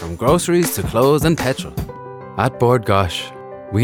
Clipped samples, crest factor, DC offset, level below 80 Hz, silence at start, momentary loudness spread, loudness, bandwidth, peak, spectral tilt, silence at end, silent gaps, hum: under 0.1%; 16 dB; under 0.1%; -38 dBFS; 0 s; 16 LU; -17 LUFS; 19 kHz; -2 dBFS; -5.5 dB/octave; 0 s; none; none